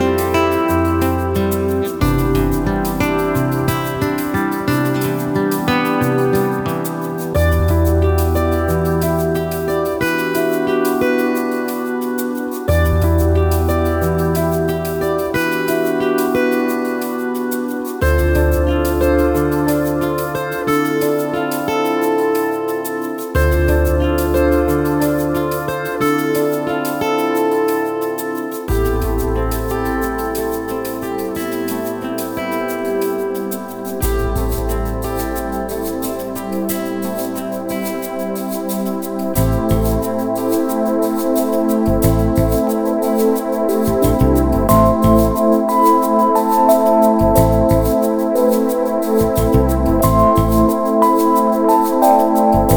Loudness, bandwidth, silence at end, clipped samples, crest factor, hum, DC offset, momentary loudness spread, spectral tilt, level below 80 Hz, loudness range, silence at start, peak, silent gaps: -17 LUFS; over 20 kHz; 0 s; under 0.1%; 16 dB; none; under 0.1%; 9 LU; -6.5 dB/octave; -26 dBFS; 7 LU; 0 s; 0 dBFS; none